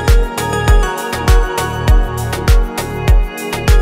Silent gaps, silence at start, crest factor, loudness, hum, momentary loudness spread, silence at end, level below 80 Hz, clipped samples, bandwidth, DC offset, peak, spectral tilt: none; 0 s; 12 dB; -15 LUFS; none; 5 LU; 0 s; -12 dBFS; under 0.1%; 16 kHz; under 0.1%; 0 dBFS; -5 dB/octave